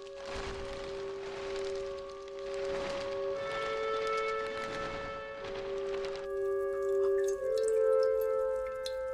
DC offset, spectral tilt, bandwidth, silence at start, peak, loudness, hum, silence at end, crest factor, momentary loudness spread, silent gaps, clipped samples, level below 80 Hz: under 0.1%; -4 dB/octave; 14.5 kHz; 0 s; -20 dBFS; -34 LUFS; none; 0 s; 14 dB; 11 LU; none; under 0.1%; -56 dBFS